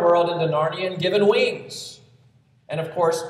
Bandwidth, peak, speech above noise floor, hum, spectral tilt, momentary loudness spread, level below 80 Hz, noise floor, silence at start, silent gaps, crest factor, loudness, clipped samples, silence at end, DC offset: 13 kHz; -6 dBFS; 35 dB; none; -5 dB/octave; 15 LU; -70 dBFS; -57 dBFS; 0 s; none; 16 dB; -21 LUFS; under 0.1%; 0 s; under 0.1%